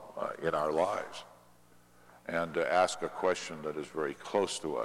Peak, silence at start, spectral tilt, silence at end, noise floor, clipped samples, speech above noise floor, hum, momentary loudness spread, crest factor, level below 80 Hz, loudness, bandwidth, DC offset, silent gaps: -14 dBFS; 0 s; -3.5 dB/octave; 0 s; -62 dBFS; under 0.1%; 29 dB; 60 Hz at -65 dBFS; 10 LU; 20 dB; -70 dBFS; -33 LUFS; 15.5 kHz; under 0.1%; none